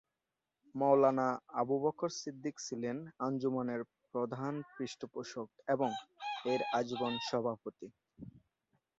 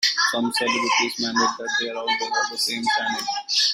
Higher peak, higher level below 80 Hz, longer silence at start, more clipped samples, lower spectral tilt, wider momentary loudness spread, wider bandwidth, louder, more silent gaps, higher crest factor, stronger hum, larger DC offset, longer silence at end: second, -16 dBFS vs -6 dBFS; second, -78 dBFS vs -68 dBFS; first, 0.75 s vs 0 s; neither; first, -4.5 dB/octave vs -0.5 dB/octave; first, 15 LU vs 5 LU; second, 7.6 kHz vs 16 kHz; second, -36 LUFS vs -22 LUFS; neither; about the same, 20 dB vs 16 dB; neither; neither; first, 0.6 s vs 0 s